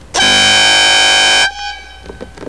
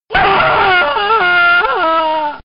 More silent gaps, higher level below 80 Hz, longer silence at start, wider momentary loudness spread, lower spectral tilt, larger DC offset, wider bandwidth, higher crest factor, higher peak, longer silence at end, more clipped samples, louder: neither; about the same, -38 dBFS vs -38 dBFS; about the same, 0.15 s vs 0.1 s; first, 12 LU vs 4 LU; about the same, 0.5 dB/octave vs 0 dB/octave; first, 0.8% vs under 0.1%; first, 11 kHz vs 5.4 kHz; about the same, 12 dB vs 12 dB; about the same, 0 dBFS vs 0 dBFS; about the same, 0 s vs 0.05 s; neither; first, -7 LUFS vs -11 LUFS